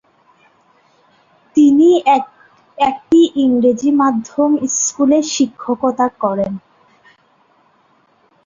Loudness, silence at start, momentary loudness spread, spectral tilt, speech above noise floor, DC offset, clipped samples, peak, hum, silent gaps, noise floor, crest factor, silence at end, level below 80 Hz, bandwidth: -14 LUFS; 1.55 s; 8 LU; -4 dB/octave; 41 dB; under 0.1%; under 0.1%; -2 dBFS; none; none; -55 dBFS; 14 dB; 1.9 s; -58 dBFS; 7.6 kHz